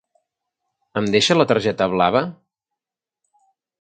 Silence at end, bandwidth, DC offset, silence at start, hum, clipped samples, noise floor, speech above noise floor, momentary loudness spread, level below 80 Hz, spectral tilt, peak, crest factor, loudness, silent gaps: 1.45 s; 9.4 kHz; under 0.1%; 0.95 s; none; under 0.1%; -88 dBFS; 70 dB; 11 LU; -56 dBFS; -4.5 dB/octave; 0 dBFS; 22 dB; -18 LUFS; none